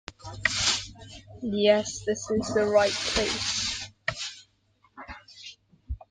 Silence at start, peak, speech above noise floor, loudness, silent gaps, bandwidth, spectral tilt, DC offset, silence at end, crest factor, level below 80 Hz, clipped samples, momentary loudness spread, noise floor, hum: 0.1 s; -6 dBFS; 41 dB; -26 LUFS; none; 10 kHz; -2.5 dB/octave; under 0.1%; 0.15 s; 22 dB; -48 dBFS; under 0.1%; 21 LU; -66 dBFS; none